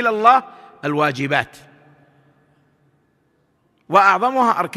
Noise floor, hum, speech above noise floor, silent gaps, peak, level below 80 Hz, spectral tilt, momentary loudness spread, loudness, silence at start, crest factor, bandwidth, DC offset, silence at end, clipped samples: -63 dBFS; none; 47 dB; none; 0 dBFS; -66 dBFS; -5.5 dB/octave; 10 LU; -17 LUFS; 0 s; 20 dB; 14 kHz; under 0.1%; 0 s; under 0.1%